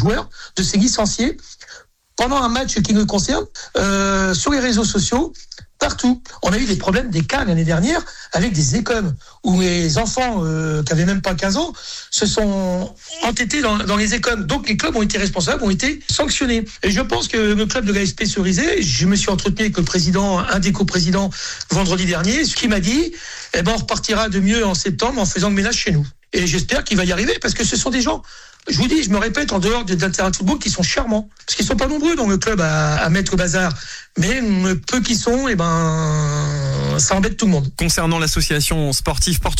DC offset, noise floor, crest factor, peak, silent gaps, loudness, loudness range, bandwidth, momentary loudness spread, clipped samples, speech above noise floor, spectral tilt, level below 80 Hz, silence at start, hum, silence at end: under 0.1%; -43 dBFS; 12 dB; -6 dBFS; none; -18 LUFS; 2 LU; 16 kHz; 5 LU; under 0.1%; 26 dB; -4 dB/octave; -30 dBFS; 0 s; none; 0 s